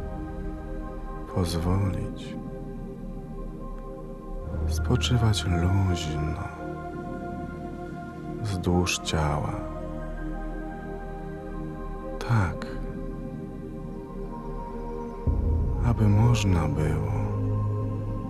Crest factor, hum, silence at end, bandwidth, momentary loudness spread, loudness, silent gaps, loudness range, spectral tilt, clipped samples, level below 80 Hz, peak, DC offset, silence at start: 18 dB; none; 0 s; 13 kHz; 14 LU; -29 LUFS; none; 7 LU; -6 dB/octave; under 0.1%; -36 dBFS; -10 dBFS; under 0.1%; 0 s